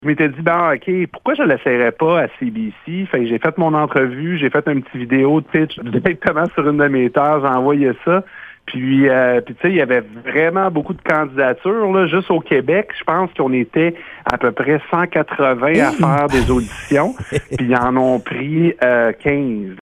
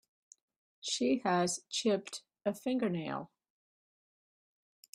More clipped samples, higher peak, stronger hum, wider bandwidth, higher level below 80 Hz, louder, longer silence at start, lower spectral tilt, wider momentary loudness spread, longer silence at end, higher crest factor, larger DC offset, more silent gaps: neither; first, 0 dBFS vs -18 dBFS; neither; second, 12.5 kHz vs 15.5 kHz; first, -40 dBFS vs -78 dBFS; first, -16 LUFS vs -34 LUFS; second, 0 s vs 0.85 s; first, -7 dB/octave vs -4 dB/octave; second, 6 LU vs 12 LU; second, 0 s vs 1.7 s; about the same, 16 dB vs 18 dB; neither; neither